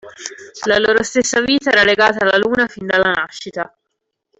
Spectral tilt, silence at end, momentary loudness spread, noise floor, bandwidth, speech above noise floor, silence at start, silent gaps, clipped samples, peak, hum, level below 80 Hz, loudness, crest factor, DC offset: -2.5 dB/octave; 0.75 s; 16 LU; -75 dBFS; 8.4 kHz; 60 dB; 0.05 s; none; under 0.1%; -2 dBFS; none; -52 dBFS; -14 LUFS; 14 dB; under 0.1%